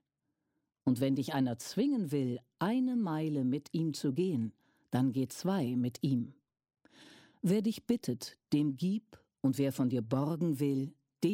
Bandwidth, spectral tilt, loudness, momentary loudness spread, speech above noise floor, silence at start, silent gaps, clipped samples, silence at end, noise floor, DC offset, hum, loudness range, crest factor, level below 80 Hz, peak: 16.5 kHz; -7 dB/octave; -34 LUFS; 6 LU; 53 dB; 0.85 s; none; under 0.1%; 0 s; -85 dBFS; under 0.1%; none; 2 LU; 16 dB; -74 dBFS; -18 dBFS